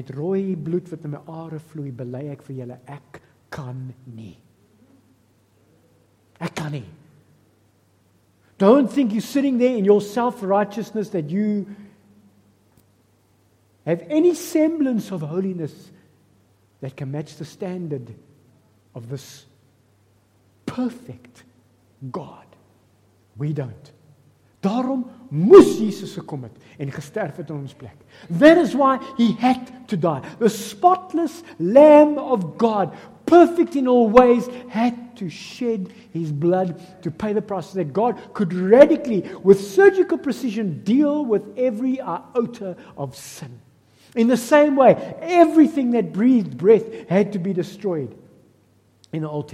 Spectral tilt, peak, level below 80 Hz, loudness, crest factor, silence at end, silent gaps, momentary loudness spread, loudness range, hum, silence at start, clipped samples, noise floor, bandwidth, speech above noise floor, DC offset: -7 dB/octave; 0 dBFS; -58 dBFS; -19 LUFS; 20 dB; 0.05 s; none; 21 LU; 19 LU; none; 0 s; under 0.1%; -60 dBFS; 15.5 kHz; 41 dB; under 0.1%